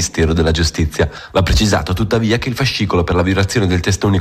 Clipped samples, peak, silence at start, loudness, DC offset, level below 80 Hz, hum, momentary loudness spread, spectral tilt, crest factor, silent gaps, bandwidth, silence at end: under 0.1%; -4 dBFS; 0 s; -15 LUFS; under 0.1%; -24 dBFS; none; 3 LU; -5 dB/octave; 10 dB; none; 14.5 kHz; 0 s